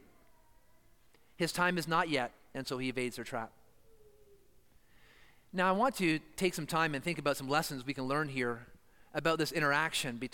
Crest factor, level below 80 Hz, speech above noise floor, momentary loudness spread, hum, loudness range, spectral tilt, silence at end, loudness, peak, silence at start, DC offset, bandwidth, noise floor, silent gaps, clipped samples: 20 dB; -64 dBFS; 34 dB; 11 LU; none; 6 LU; -4.5 dB/octave; 0.05 s; -33 LUFS; -16 dBFS; 1.4 s; under 0.1%; 17 kHz; -67 dBFS; none; under 0.1%